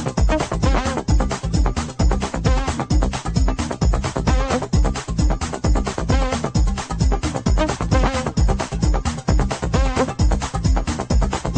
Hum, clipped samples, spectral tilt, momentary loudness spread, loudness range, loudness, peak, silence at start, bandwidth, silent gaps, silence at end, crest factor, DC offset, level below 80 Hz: none; under 0.1%; -5.5 dB/octave; 2 LU; 1 LU; -21 LUFS; -4 dBFS; 0 s; 9.4 kHz; none; 0 s; 14 dB; under 0.1%; -22 dBFS